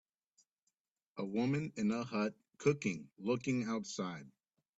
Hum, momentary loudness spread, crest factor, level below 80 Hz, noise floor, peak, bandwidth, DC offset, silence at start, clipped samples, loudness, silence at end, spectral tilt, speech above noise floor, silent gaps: none; 8 LU; 22 dB; -76 dBFS; -86 dBFS; -18 dBFS; 8 kHz; under 0.1%; 1.15 s; under 0.1%; -38 LUFS; 0.5 s; -6 dB/octave; 49 dB; none